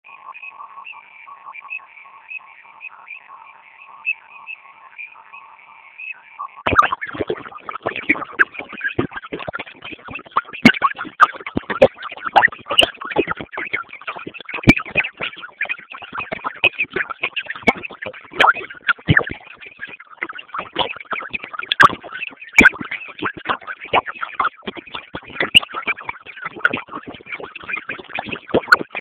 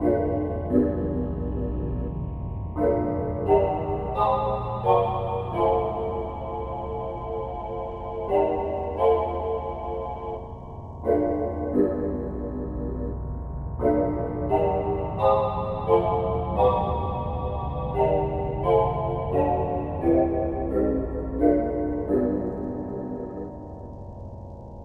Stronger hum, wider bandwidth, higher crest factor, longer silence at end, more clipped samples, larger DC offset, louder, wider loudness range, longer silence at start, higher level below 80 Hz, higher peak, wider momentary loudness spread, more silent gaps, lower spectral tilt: neither; first, 15 kHz vs 4.6 kHz; about the same, 22 dB vs 18 dB; about the same, 0 s vs 0 s; first, 0.1% vs under 0.1%; neither; first, -19 LUFS vs -26 LUFS; first, 14 LU vs 4 LU; about the same, 0.05 s vs 0 s; second, -46 dBFS vs -36 dBFS; first, 0 dBFS vs -8 dBFS; first, 21 LU vs 11 LU; neither; second, -4 dB/octave vs -10.5 dB/octave